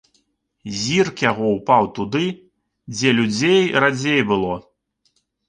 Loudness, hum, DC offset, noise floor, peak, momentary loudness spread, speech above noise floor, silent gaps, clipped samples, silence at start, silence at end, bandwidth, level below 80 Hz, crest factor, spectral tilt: -18 LUFS; none; under 0.1%; -67 dBFS; -2 dBFS; 14 LU; 49 dB; none; under 0.1%; 0.65 s; 0.9 s; 9.8 kHz; -54 dBFS; 18 dB; -4.5 dB/octave